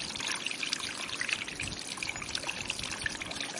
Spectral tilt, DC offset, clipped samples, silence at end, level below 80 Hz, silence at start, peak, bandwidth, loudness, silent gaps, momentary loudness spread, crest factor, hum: -1 dB/octave; under 0.1%; under 0.1%; 0 s; -58 dBFS; 0 s; -12 dBFS; 11.5 kHz; -34 LUFS; none; 3 LU; 26 dB; none